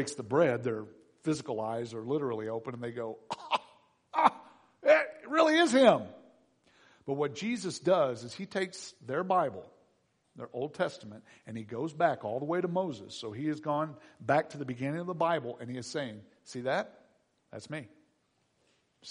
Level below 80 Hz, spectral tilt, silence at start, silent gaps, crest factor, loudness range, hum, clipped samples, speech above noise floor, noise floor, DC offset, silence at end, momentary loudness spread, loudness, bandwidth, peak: -78 dBFS; -5 dB/octave; 0 s; none; 24 dB; 8 LU; none; under 0.1%; 43 dB; -74 dBFS; under 0.1%; 0 s; 19 LU; -31 LUFS; 10.5 kHz; -8 dBFS